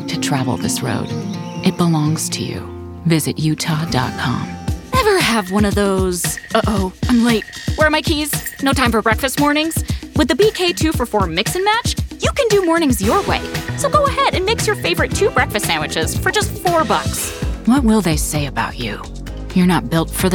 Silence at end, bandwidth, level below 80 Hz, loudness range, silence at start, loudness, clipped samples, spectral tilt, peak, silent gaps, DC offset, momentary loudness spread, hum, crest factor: 0 s; 19.5 kHz; -32 dBFS; 3 LU; 0 s; -17 LUFS; under 0.1%; -4.5 dB/octave; -2 dBFS; none; under 0.1%; 8 LU; none; 16 dB